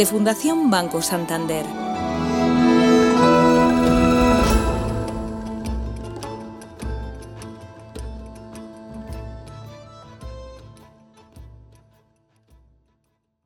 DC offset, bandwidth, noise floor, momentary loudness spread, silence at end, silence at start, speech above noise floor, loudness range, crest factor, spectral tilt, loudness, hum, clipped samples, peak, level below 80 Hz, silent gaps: under 0.1%; 17.5 kHz; -70 dBFS; 24 LU; 2 s; 0 s; 50 dB; 22 LU; 18 dB; -5.5 dB/octave; -19 LUFS; none; under 0.1%; -4 dBFS; -34 dBFS; none